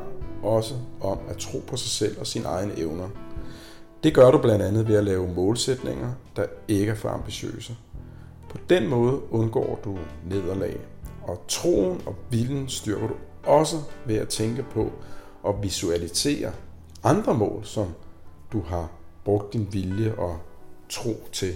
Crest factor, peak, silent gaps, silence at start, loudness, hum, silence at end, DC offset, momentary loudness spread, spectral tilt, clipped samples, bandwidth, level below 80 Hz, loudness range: 20 dB; -4 dBFS; none; 0 s; -25 LUFS; none; 0 s; under 0.1%; 17 LU; -5.5 dB/octave; under 0.1%; 16.5 kHz; -46 dBFS; 7 LU